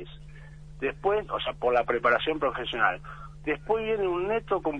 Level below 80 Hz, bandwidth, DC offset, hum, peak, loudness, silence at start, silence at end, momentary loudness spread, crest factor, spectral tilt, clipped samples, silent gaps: -48 dBFS; 9.6 kHz; under 0.1%; none; -8 dBFS; -27 LUFS; 0 s; 0 s; 20 LU; 20 dB; -6.5 dB/octave; under 0.1%; none